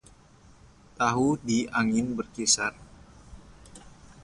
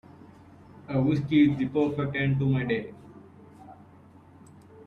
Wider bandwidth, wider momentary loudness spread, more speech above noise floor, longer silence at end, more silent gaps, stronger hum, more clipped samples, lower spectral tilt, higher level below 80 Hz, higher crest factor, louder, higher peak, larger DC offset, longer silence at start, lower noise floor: first, 11.5 kHz vs 6.4 kHz; second, 6 LU vs 9 LU; about the same, 29 dB vs 28 dB; about the same, 0 s vs 0.05 s; neither; neither; neither; second, -3 dB/octave vs -9 dB/octave; about the same, -56 dBFS vs -58 dBFS; about the same, 22 dB vs 18 dB; about the same, -26 LUFS vs -26 LUFS; first, -8 dBFS vs -12 dBFS; neither; about the same, 1 s vs 0.9 s; about the same, -55 dBFS vs -53 dBFS